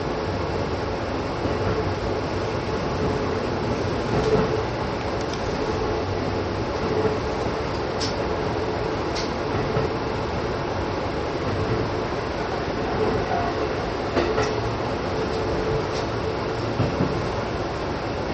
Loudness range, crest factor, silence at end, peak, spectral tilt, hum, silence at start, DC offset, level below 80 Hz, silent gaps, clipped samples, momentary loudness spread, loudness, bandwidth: 1 LU; 18 dB; 0 s; -8 dBFS; -6 dB/octave; none; 0 s; under 0.1%; -38 dBFS; none; under 0.1%; 3 LU; -25 LUFS; 8.4 kHz